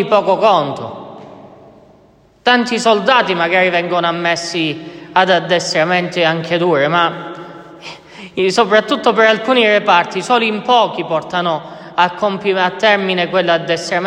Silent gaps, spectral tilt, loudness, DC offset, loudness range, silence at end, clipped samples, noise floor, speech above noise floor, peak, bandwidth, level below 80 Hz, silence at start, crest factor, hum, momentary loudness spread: none; -4 dB/octave; -14 LUFS; under 0.1%; 3 LU; 0 s; under 0.1%; -49 dBFS; 35 dB; 0 dBFS; 11.5 kHz; -60 dBFS; 0 s; 14 dB; none; 16 LU